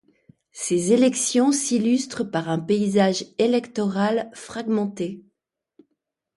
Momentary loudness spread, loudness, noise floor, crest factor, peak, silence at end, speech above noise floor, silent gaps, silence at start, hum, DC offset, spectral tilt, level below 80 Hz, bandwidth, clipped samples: 12 LU; -22 LUFS; -80 dBFS; 16 dB; -6 dBFS; 1.15 s; 58 dB; none; 0.55 s; none; under 0.1%; -4.5 dB/octave; -66 dBFS; 11.5 kHz; under 0.1%